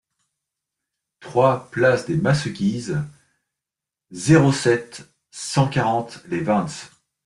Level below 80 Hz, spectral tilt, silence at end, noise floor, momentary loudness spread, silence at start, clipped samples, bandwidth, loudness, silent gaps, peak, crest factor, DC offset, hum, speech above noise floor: -54 dBFS; -6 dB/octave; 0.4 s; -87 dBFS; 19 LU; 1.2 s; under 0.1%; 11.5 kHz; -20 LUFS; none; -4 dBFS; 20 dB; under 0.1%; none; 67 dB